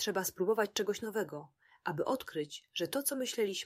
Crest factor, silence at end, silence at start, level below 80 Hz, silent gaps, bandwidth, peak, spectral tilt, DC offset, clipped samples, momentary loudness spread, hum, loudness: 18 dB; 0 s; 0 s; -76 dBFS; none; 16 kHz; -18 dBFS; -3 dB/octave; under 0.1%; under 0.1%; 8 LU; none; -35 LUFS